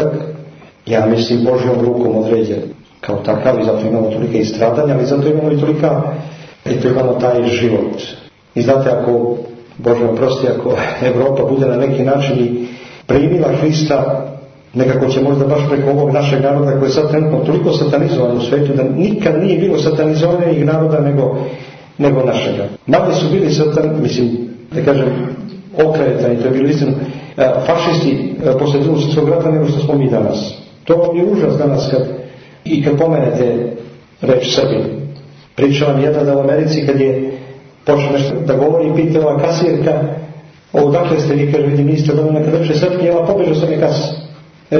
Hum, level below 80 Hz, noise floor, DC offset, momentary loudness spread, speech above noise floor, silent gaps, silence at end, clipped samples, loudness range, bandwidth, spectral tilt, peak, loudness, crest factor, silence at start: none; -46 dBFS; -35 dBFS; under 0.1%; 10 LU; 23 dB; none; 0 s; under 0.1%; 2 LU; 6.6 kHz; -7.5 dB/octave; 0 dBFS; -14 LUFS; 14 dB; 0 s